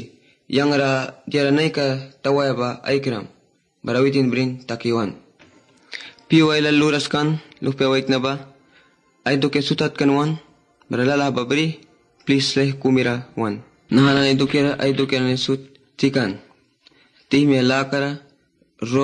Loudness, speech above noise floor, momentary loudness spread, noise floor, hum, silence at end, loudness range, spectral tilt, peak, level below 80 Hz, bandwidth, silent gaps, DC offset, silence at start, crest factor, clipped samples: -20 LUFS; 41 dB; 11 LU; -60 dBFS; none; 0 s; 3 LU; -6 dB/octave; -4 dBFS; -58 dBFS; 9.8 kHz; none; under 0.1%; 0 s; 16 dB; under 0.1%